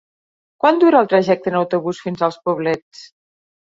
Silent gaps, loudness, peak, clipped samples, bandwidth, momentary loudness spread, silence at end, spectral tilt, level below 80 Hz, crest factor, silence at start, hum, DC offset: 2.82-2.91 s; -17 LUFS; 0 dBFS; under 0.1%; 7.6 kHz; 10 LU; 0.7 s; -7 dB/octave; -64 dBFS; 18 dB; 0.65 s; none; under 0.1%